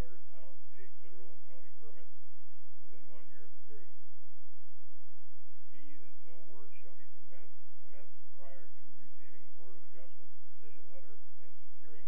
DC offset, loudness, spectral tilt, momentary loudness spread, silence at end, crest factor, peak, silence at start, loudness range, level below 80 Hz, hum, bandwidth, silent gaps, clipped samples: 8%; -63 LUFS; -9 dB/octave; 6 LU; 0 s; 14 dB; -22 dBFS; 0 s; 3 LU; -66 dBFS; none; 3.4 kHz; none; under 0.1%